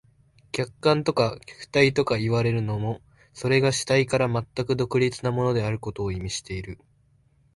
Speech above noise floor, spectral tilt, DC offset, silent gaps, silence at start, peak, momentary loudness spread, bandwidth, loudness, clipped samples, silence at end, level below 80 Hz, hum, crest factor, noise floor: 38 dB; -5.5 dB/octave; under 0.1%; none; 0.55 s; -6 dBFS; 12 LU; 11.5 kHz; -25 LUFS; under 0.1%; 0.8 s; -50 dBFS; none; 20 dB; -62 dBFS